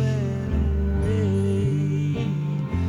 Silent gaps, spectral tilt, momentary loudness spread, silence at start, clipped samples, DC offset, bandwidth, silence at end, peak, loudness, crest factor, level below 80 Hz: none; -8.5 dB/octave; 3 LU; 0 s; under 0.1%; under 0.1%; 10.5 kHz; 0 s; -12 dBFS; -24 LUFS; 10 dB; -32 dBFS